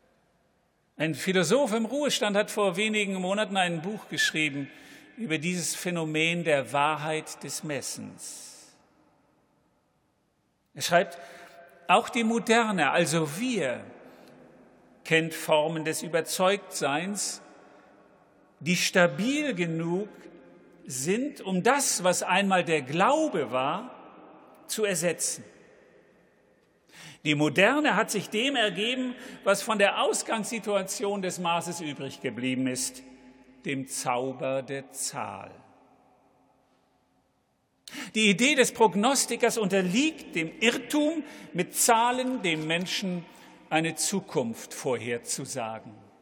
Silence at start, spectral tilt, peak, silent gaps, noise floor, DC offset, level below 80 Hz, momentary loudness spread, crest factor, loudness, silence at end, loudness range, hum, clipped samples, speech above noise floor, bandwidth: 1 s; -3.5 dB/octave; -6 dBFS; none; -72 dBFS; under 0.1%; -76 dBFS; 13 LU; 22 dB; -27 LUFS; 0.2 s; 8 LU; none; under 0.1%; 45 dB; 19 kHz